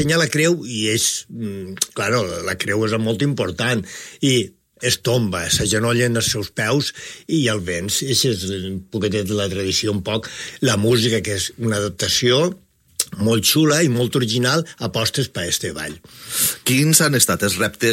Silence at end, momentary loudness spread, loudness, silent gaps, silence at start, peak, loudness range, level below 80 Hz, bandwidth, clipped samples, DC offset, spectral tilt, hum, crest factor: 0 s; 10 LU; -19 LUFS; none; 0 s; 0 dBFS; 3 LU; -48 dBFS; 16.5 kHz; under 0.1%; under 0.1%; -3.5 dB/octave; none; 20 dB